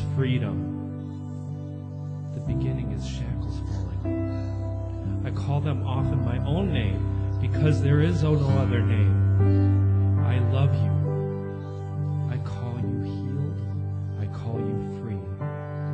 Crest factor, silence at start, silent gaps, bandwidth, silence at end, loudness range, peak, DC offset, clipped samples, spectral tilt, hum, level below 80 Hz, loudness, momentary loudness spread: 16 dB; 0 s; none; 7 kHz; 0 s; 8 LU; -8 dBFS; under 0.1%; under 0.1%; -9 dB/octave; none; -40 dBFS; -26 LUFS; 12 LU